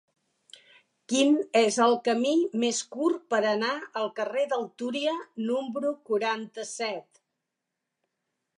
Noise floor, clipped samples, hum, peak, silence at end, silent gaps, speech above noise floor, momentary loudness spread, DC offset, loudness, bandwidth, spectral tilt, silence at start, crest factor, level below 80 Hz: -85 dBFS; under 0.1%; none; -10 dBFS; 1.6 s; none; 58 dB; 10 LU; under 0.1%; -27 LUFS; 11 kHz; -3 dB/octave; 1.1 s; 18 dB; -86 dBFS